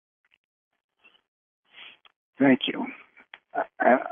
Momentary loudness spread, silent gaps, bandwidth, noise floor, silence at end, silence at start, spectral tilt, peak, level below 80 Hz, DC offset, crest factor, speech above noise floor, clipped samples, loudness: 25 LU; 2.16-2.33 s; 3.7 kHz; -53 dBFS; 0 s; 1.8 s; -9 dB/octave; -6 dBFS; -84 dBFS; under 0.1%; 22 dB; 30 dB; under 0.1%; -25 LUFS